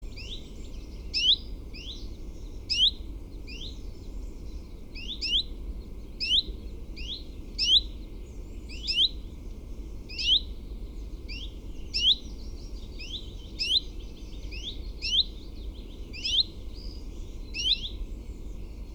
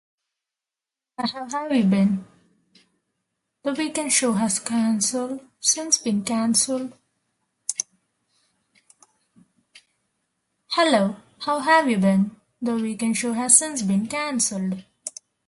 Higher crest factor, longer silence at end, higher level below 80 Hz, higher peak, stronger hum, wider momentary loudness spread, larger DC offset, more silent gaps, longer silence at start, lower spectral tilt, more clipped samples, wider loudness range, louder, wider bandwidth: about the same, 22 dB vs 24 dB; second, 0 s vs 0.4 s; first, -40 dBFS vs -68 dBFS; second, -10 dBFS vs -2 dBFS; neither; first, 21 LU vs 13 LU; neither; neither; second, 0 s vs 1.2 s; about the same, -2.5 dB/octave vs -3.5 dB/octave; neither; second, 4 LU vs 11 LU; second, -26 LUFS vs -22 LUFS; first, 19.5 kHz vs 12 kHz